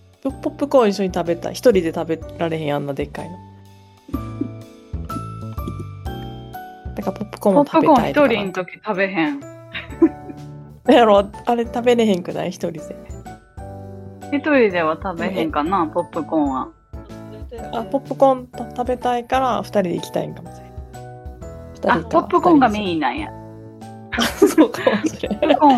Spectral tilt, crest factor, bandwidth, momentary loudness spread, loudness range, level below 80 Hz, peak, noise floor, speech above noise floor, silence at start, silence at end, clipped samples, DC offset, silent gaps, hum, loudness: -6 dB/octave; 18 dB; 14.5 kHz; 22 LU; 9 LU; -42 dBFS; -2 dBFS; -46 dBFS; 28 dB; 0.25 s; 0 s; under 0.1%; under 0.1%; none; none; -19 LUFS